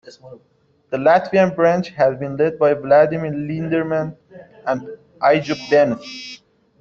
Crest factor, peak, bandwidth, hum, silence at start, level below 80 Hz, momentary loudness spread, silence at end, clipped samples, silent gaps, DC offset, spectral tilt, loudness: 16 dB; -2 dBFS; 7.2 kHz; none; 0.05 s; -58 dBFS; 14 LU; 0.45 s; under 0.1%; none; under 0.1%; -7 dB/octave; -18 LUFS